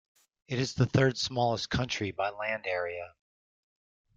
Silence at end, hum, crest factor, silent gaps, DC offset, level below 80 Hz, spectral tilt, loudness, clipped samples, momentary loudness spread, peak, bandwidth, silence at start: 1.1 s; none; 22 dB; none; under 0.1%; -56 dBFS; -5 dB/octave; -30 LUFS; under 0.1%; 11 LU; -10 dBFS; 7.8 kHz; 0.5 s